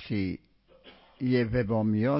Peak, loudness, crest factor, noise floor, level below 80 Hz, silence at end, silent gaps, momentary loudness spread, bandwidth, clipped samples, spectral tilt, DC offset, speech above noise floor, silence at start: -14 dBFS; -28 LUFS; 14 dB; -56 dBFS; -50 dBFS; 0 s; none; 9 LU; 5.8 kHz; under 0.1%; -11.5 dB/octave; under 0.1%; 29 dB; 0 s